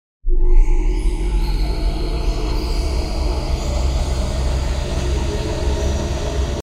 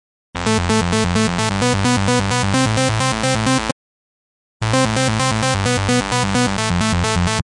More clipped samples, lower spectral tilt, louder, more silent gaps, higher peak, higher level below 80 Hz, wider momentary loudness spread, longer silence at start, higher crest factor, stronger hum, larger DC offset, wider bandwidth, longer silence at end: neither; about the same, -5.5 dB/octave vs -4.5 dB/octave; second, -22 LUFS vs -17 LUFS; second, none vs 3.72-4.60 s; about the same, -2 dBFS vs 0 dBFS; first, -18 dBFS vs -36 dBFS; about the same, 3 LU vs 4 LU; about the same, 0.25 s vs 0.35 s; about the same, 14 dB vs 18 dB; neither; neither; about the same, 11 kHz vs 11.5 kHz; about the same, 0 s vs 0 s